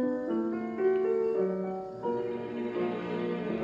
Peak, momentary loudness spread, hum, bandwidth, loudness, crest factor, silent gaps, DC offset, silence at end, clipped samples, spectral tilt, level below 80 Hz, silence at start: -18 dBFS; 7 LU; none; 7 kHz; -31 LUFS; 14 dB; none; under 0.1%; 0 s; under 0.1%; -8.5 dB/octave; -68 dBFS; 0 s